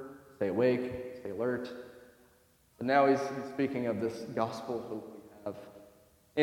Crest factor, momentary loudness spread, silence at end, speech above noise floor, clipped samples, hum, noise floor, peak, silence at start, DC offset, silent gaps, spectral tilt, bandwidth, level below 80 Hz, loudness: 22 dB; 20 LU; 0 s; 34 dB; under 0.1%; none; -66 dBFS; -12 dBFS; 0 s; under 0.1%; none; -6.5 dB/octave; 17.5 kHz; -70 dBFS; -33 LUFS